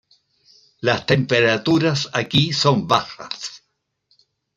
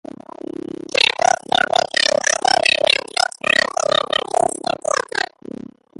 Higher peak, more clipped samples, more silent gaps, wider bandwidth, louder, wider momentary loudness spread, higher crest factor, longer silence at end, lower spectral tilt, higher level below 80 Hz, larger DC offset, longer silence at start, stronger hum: about the same, -2 dBFS vs 0 dBFS; neither; neither; second, 9.4 kHz vs 11.5 kHz; about the same, -19 LUFS vs -17 LUFS; second, 13 LU vs 17 LU; about the same, 20 dB vs 20 dB; first, 1 s vs 0.8 s; first, -5 dB/octave vs -0.5 dB/octave; about the same, -56 dBFS vs -58 dBFS; neither; about the same, 0.85 s vs 0.95 s; neither